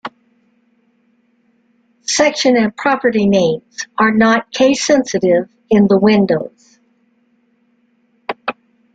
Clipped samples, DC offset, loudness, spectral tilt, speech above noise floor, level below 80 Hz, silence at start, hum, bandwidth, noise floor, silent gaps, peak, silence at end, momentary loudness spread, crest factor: under 0.1%; under 0.1%; -14 LUFS; -4.5 dB/octave; 46 dB; -54 dBFS; 0.05 s; none; 9.2 kHz; -59 dBFS; none; -2 dBFS; 0.4 s; 15 LU; 14 dB